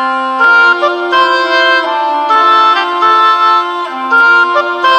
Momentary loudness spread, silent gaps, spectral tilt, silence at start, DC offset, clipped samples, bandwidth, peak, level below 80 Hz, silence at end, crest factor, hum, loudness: 6 LU; none; -1.5 dB/octave; 0 s; under 0.1%; under 0.1%; 9 kHz; 0 dBFS; -64 dBFS; 0 s; 8 dB; none; -8 LUFS